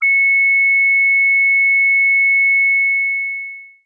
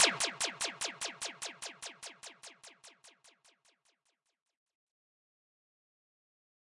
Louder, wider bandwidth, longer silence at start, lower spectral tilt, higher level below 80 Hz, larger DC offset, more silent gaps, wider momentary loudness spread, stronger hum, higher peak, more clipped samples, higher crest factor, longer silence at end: first, -11 LUFS vs -36 LUFS; second, 2.4 kHz vs 11.5 kHz; about the same, 0 s vs 0 s; second, 3 dB/octave vs 0.5 dB/octave; second, under -90 dBFS vs -84 dBFS; neither; neither; second, 8 LU vs 21 LU; neither; first, -10 dBFS vs -14 dBFS; neither; second, 4 dB vs 28 dB; second, 0.2 s vs 3.55 s